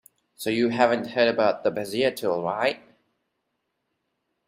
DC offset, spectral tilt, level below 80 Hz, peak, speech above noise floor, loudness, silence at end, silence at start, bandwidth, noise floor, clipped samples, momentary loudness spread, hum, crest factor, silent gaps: under 0.1%; -5 dB/octave; -68 dBFS; -6 dBFS; 54 dB; -24 LUFS; 1.7 s; 0.4 s; 16 kHz; -78 dBFS; under 0.1%; 6 LU; none; 20 dB; none